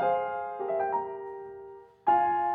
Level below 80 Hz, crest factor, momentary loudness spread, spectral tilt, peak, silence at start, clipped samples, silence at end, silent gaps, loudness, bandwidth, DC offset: -72 dBFS; 16 dB; 19 LU; -8 dB/octave; -14 dBFS; 0 s; under 0.1%; 0 s; none; -29 LUFS; 3.8 kHz; under 0.1%